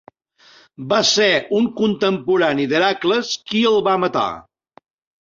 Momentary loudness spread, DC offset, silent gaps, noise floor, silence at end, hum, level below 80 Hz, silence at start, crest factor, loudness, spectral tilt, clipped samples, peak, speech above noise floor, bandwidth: 7 LU; under 0.1%; none; -52 dBFS; 0.8 s; none; -60 dBFS; 0.8 s; 16 dB; -17 LUFS; -3.5 dB/octave; under 0.1%; -2 dBFS; 34 dB; 7.8 kHz